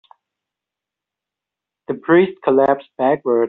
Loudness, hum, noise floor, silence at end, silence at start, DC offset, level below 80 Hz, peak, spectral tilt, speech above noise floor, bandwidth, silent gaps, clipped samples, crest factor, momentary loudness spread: -17 LUFS; 50 Hz at -55 dBFS; -86 dBFS; 0 s; 1.9 s; under 0.1%; -62 dBFS; -2 dBFS; -5.5 dB/octave; 70 dB; 4.1 kHz; none; under 0.1%; 16 dB; 9 LU